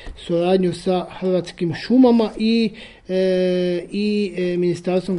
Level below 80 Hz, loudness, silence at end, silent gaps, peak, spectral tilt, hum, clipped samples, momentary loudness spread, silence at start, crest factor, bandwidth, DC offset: -46 dBFS; -20 LUFS; 0 s; none; -4 dBFS; -7 dB/octave; none; under 0.1%; 9 LU; 0 s; 14 dB; 11 kHz; under 0.1%